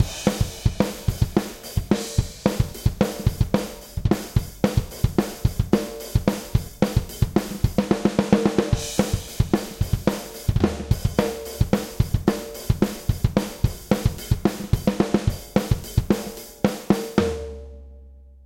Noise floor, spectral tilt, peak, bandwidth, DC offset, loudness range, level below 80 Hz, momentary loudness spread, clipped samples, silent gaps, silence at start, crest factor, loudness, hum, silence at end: -45 dBFS; -6.5 dB/octave; -2 dBFS; 17 kHz; under 0.1%; 2 LU; -32 dBFS; 5 LU; under 0.1%; none; 0 s; 22 dB; -24 LUFS; none; 0.25 s